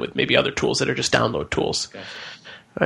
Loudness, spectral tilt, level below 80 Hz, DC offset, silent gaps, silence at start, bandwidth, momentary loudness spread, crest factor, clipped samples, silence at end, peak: -21 LUFS; -3.5 dB/octave; -48 dBFS; under 0.1%; none; 0 s; 12 kHz; 18 LU; 22 dB; under 0.1%; 0 s; -2 dBFS